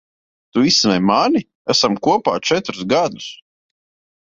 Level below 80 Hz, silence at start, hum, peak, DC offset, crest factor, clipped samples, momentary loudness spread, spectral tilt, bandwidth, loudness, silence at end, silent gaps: -56 dBFS; 0.55 s; none; -2 dBFS; under 0.1%; 16 dB; under 0.1%; 10 LU; -4 dB/octave; 7.8 kHz; -16 LUFS; 0.9 s; 1.55-1.65 s